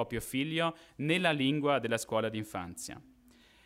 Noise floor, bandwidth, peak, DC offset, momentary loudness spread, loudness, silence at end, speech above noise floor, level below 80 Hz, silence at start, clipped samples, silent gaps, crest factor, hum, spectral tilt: -62 dBFS; 16 kHz; -14 dBFS; under 0.1%; 13 LU; -32 LUFS; 0.65 s; 29 dB; -62 dBFS; 0 s; under 0.1%; none; 20 dB; none; -4.5 dB/octave